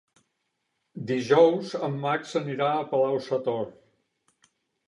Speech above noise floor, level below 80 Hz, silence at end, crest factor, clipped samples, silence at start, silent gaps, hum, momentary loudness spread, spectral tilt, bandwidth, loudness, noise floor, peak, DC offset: 53 dB; -76 dBFS; 1.15 s; 20 dB; under 0.1%; 0.95 s; none; none; 13 LU; -6.5 dB/octave; 11 kHz; -25 LUFS; -78 dBFS; -6 dBFS; under 0.1%